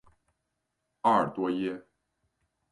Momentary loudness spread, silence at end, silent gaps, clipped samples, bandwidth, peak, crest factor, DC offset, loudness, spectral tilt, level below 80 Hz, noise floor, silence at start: 10 LU; 0.9 s; none; under 0.1%; 11 kHz; -10 dBFS; 22 dB; under 0.1%; -28 LUFS; -7 dB/octave; -70 dBFS; -82 dBFS; 1.05 s